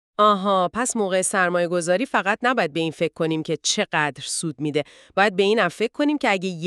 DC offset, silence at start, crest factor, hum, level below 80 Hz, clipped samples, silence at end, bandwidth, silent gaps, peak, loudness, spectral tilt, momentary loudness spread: under 0.1%; 0.2 s; 18 dB; none; -64 dBFS; under 0.1%; 0 s; 13.5 kHz; none; -4 dBFS; -21 LUFS; -3.5 dB/octave; 7 LU